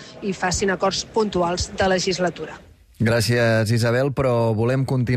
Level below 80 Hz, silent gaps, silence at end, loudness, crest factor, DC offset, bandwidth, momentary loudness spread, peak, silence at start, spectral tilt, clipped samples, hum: -42 dBFS; none; 0 s; -21 LUFS; 12 dB; under 0.1%; 15 kHz; 6 LU; -8 dBFS; 0 s; -5 dB/octave; under 0.1%; none